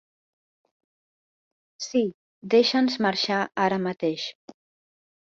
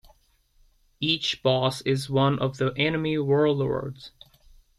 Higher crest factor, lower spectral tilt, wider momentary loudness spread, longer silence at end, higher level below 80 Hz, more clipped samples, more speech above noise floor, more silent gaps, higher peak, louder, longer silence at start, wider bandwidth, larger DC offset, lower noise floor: about the same, 20 dB vs 18 dB; second, -4.5 dB/octave vs -6 dB/octave; first, 13 LU vs 9 LU; first, 1.1 s vs 0.7 s; second, -72 dBFS vs -56 dBFS; neither; first, over 66 dB vs 38 dB; first, 2.14-2.41 s vs none; about the same, -8 dBFS vs -8 dBFS; about the same, -24 LUFS vs -25 LUFS; first, 1.8 s vs 1 s; second, 7.8 kHz vs 13 kHz; neither; first, under -90 dBFS vs -63 dBFS